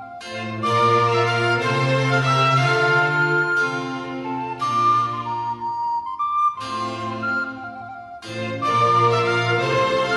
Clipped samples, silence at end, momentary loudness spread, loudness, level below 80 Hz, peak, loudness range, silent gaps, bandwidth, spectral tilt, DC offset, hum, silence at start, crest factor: under 0.1%; 0 s; 12 LU; -20 LUFS; -58 dBFS; -6 dBFS; 6 LU; none; 11.5 kHz; -5.5 dB/octave; under 0.1%; none; 0 s; 16 dB